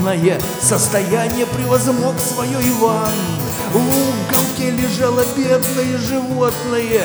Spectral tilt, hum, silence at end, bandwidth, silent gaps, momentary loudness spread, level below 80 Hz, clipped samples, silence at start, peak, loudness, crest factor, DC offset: -4.5 dB/octave; none; 0 s; over 20 kHz; none; 4 LU; -42 dBFS; under 0.1%; 0 s; 0 dBFS; -16 LUFS; 16 dB; under 0.1%